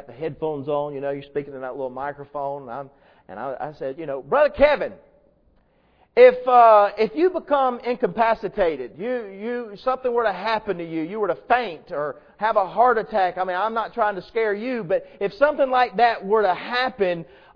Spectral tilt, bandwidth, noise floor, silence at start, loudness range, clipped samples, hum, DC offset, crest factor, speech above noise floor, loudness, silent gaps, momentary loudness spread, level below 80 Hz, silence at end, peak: -7.5 dB/octave; 5.4 kHz; -60 dBFS; 0.1 s; 10 LU; under 0.1%; none; under 0.1%; 20 dB; 39 dB; -22 LUFS; none; 14 LU; -52 dBFS; 0.3 s; -2 dBFS